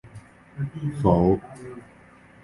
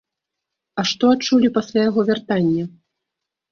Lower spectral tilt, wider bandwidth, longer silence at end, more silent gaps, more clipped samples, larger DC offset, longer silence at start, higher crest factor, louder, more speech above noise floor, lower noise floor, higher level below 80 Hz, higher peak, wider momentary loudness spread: first, -9.5 dB/octave vs -5.5 dB/octave; first, 11.5 kHz vs 7.2 kHz; second, 0.65 s vs 0.85 s; neither; neither; neither; second, 0.05 s vs 0.75 s; first, 22 dB vs 16 dB; second, -24 LUFS vs -18 LUFS; second, 29 dB vs 65 dB; second, -51 dBFS vs -82 dBFS; first, -44 dBFS vs -60 dBFS; about the same, -4 dBFS vs -4 dBFS; first, 23 LU vs 8 LU